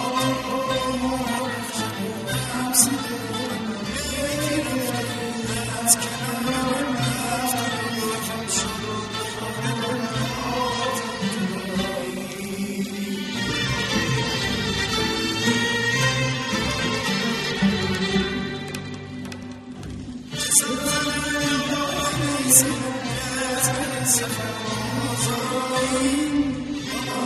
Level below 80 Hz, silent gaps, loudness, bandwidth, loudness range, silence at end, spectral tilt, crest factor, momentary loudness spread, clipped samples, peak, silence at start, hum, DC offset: -46 dBFS; none; -23 LUFS; 13.5 kHz; 5 LU; 0 s; -3 dB/octave; 24 dB; 9 LU; under 0.1%; 0 dBFS; 0 s; none; under 0.1%